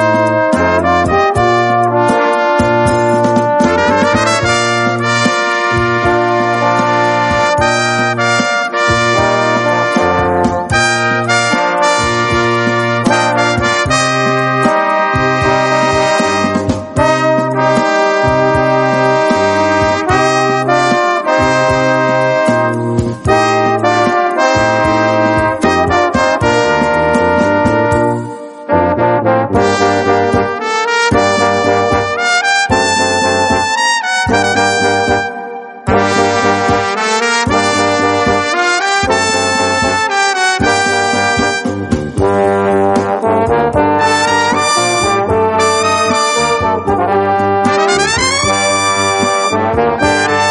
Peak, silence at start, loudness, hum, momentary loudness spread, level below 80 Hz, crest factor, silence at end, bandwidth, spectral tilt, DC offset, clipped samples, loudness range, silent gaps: 0 dBFS; 0 s; -11 LUFS; none; 2 LU; -36 dBFS; 12 dB; 0 s; 11.5 kHz; -4 dB/octave; under 0.1%; under 0.1%; 1 LU; none